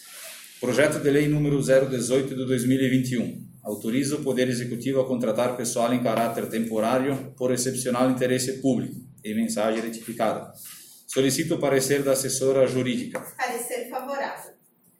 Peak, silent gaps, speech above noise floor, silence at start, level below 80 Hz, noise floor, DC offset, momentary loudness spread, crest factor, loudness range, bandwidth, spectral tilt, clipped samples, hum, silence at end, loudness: -6 dBFS; none; 33 dB; 0 s; -60 dBFS; -57 dBFS; under 0.1%; 12 LU; 18 dB; 3 LU; 17 kHz; -5 dB/octave; under 0.1%; none; 0.5 s; -25 LUFS